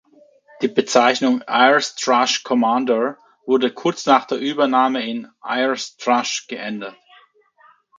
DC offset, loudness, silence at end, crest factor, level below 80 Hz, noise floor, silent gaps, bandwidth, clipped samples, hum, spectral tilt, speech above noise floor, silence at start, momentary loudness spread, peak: under 0.1%; -18 LUFS; 1.05 s; 20 dB; -72 dBFS; -54 dBFS; none; 9.2 kHz; under 0.1%; none; -3 dB/octave; 36 dB; 0.6 s; 12 LU; 0 dBFS